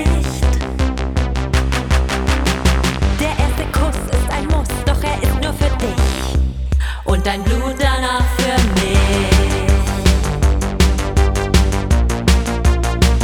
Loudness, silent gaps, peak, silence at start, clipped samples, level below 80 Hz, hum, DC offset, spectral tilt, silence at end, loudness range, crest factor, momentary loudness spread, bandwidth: -17 LUFS; none; 0 dBFS; 0 s; under 0.1%; -16 dBFS; none; under 0.1%; -5 dB/octave; 0 s; 3 LU; 14 dB; 4 LU; 15.5 kHz